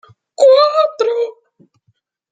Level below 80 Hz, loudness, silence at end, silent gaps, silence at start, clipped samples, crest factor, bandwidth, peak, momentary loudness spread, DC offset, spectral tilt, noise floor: -74 dBFS; -13 LUFS; 1 s; none; 0.4 s; under 0.1%; 14 dB; 9.2 kHz; -2 dBFS; 11 LU; under 0.1%; -1.5 dB/octave; -63 dBFS